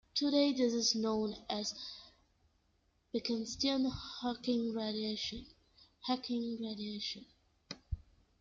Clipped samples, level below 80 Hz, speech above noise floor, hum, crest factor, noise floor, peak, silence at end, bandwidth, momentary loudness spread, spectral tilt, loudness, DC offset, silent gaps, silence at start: under 0.1%; -58 dBFS; 39 dB; none; 18 dB; -75 dBFS; -20 dBFS; 0.4 s; 7.6 kHz; 16 LU; -3.5 dB/octave; -36 LUFS; under 0.1%; none; 0.15 s